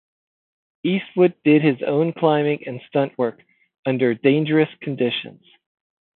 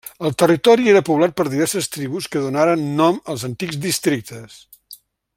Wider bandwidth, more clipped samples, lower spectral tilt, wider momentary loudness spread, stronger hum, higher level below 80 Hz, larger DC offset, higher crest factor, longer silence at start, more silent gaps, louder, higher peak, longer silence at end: second, 4.3 kHz vs 16.5 kHz; neither; first, -11.5 dB/octave vs -5 dB/octave; about the same, 10 LU vs 12 LU; neither; second, -72 dBFS vs -60 dBFS; neither; about the same, 18 dB vs 16 dB; first, 0.85 s vs 0.05 s; first, 3.79-3.83 s vs none; about the same, -20 LUFS vs -18 LUFS; about the same, -2 dBFS vs -2 dBFS; first, 0.9 s vs 0.45 s